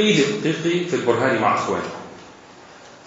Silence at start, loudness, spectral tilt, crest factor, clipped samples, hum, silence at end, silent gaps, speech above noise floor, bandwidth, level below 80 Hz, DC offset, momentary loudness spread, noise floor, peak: 0 s; -20 LUFS; -4.5 dB/octave; 18 dB; under 0.1%; none; 0.1 s; none; 24 dB; 8 kHz; -64 dBFS; under 0.1%; 18 LU; -44 dBFS; -4 dBFS